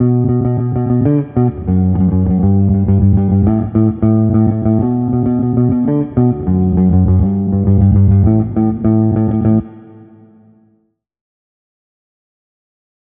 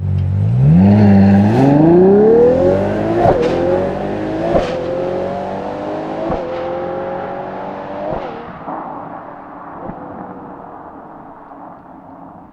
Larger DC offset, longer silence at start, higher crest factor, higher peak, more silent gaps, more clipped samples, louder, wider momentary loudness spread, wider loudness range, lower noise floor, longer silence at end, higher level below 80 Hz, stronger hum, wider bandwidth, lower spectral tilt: neither; about the same, 0 s vs 0 s; about the same, 12 dB vs 14 dB; about the same, 0 dBFS vs 0 dBFS; neither; neither; about the same, -13 LUFS vs -14 LUFS; second, 4 LU vs 24 LU; second, 5 LU vs 20 LU; first, -60 dBFS vs -36 dBFS; first, 3.4 s vs 0.05 s; first, -30 dBFS vs -38 dBFS; neither; second, 2.5 kHz vs 7.2 kHz; first, -13.5 dB/octave vs -9.5 dB/octave